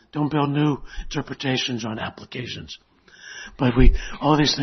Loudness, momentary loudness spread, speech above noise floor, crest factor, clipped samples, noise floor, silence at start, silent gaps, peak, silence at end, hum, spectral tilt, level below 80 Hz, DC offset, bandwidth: -23 LUFS; 19 LU; 23 dB; 22 dB; under 0.1%; -44 dBFS; 0.15 s; none; 0 dBFS; 0 s; none; -5.5 dB/octave; -26 dBFS; under 0.1%; 6.4 kHz